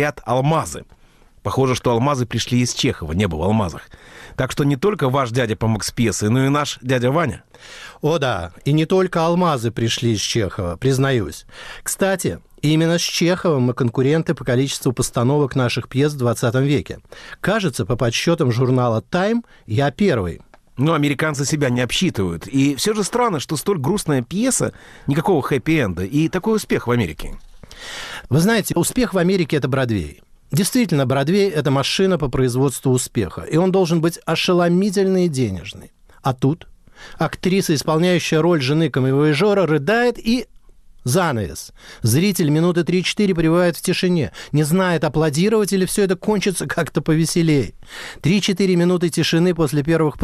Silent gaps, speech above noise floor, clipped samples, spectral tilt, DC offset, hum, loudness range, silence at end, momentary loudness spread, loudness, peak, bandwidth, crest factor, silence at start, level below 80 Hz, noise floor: none; 26 dB; under 0.1%; -5.5 dB/octave; under 0.1%; none; 2 LU; 0 s; 8 LU; -19 LUFS; -6 dBFS; 14.5 kHz; 12 dB; 0 s; -42 dBFS; -44 dBFS